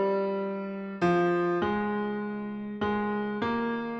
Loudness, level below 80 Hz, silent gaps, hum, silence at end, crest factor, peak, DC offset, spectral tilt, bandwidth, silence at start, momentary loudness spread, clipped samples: -29 LUFS; -62 dBFS; none; none; 0 s; 14 dB; -16 dBFS; under 0.1%; -8 dB/octave; 7.4 kHz; 0 s; 9 LU; under 0.1%